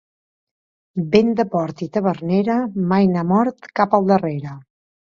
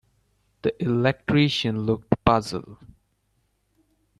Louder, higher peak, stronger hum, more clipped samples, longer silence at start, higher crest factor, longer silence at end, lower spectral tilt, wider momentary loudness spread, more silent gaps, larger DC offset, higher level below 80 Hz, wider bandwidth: first, -19 LUFS vs -23 LUFS; about the same, 0 dBFS vs 0 dBFS; neither; neither; first, 0.95 s vs 0.65 s; second, 18 dB vs 24 dB; second, 0.45 s vs 1.45 s; first, -8.5 dB/octave vs -6.5 dB/octave; about the same, 10 LU vs 9 LU; neither; neither; second, -58 dBFS vs -48 dBFS; second, 7 kHz vs 12 kHz